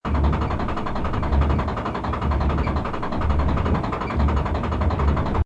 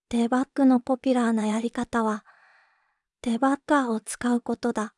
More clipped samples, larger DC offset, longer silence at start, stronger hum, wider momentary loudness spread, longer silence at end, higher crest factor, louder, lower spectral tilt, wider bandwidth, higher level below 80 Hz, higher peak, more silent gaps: neither; neither; about the same, 0.05 s vs 0.1 s; neither; second, 4 LU vs 7 LU; about the same, 0 s vs 0.1 s; about the same, 14 dB vs 16 dB; about the same, -23 LUFS vs -25 LUFS; first, -8.5 dB/octave vs -5 dB/octave; second, 7.4 kHz vs 11.5 kHz; first, -24 dBFS vs -60 dBFS; about the same, -8 dBFS vs -10 dBFS; neither